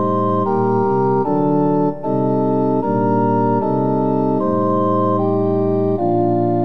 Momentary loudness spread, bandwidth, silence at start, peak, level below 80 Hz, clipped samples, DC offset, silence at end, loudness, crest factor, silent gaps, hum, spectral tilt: 1 LU; 5.6 kHz; 0 s; -4 dBFS; -70 dBFS; under 0.1%; 2%; 0 s; -17 LUFS; 12 dB; none; none; -11.5 dB/octave